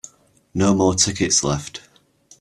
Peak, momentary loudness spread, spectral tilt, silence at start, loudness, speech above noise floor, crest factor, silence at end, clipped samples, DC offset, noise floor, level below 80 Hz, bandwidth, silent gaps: -2 dBFS; 17 LU; -3.5 dB/octave; 0.05 s; -18 LUFS; 35 dB; 20 dB; 0.6 s; under 0.1%; under 0.1%; -53 dBFS; -48 dBFS; 13 kHz; none